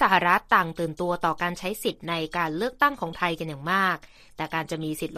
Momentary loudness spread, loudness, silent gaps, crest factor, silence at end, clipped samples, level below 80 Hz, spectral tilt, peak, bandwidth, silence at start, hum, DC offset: 10 LU; -26 LUFS; none; 22 dB; 0 s; under 0.1%; -54 dBFS; -4.5 dB/octave; -4 dBFS; 15.5 kHz; 0 s; none; under 0.1%